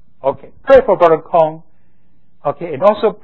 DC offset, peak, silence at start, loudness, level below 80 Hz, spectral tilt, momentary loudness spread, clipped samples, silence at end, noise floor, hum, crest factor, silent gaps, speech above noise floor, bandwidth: 1%; 0 dBFS; 0.25 s; -13 LUFS; -44 dBFS; -7.5 dB/octave; 13 LU; 0.3%; 0.1 s; -58 dBFS; none; 14 dB; none; 45 dB; 6.4 kHz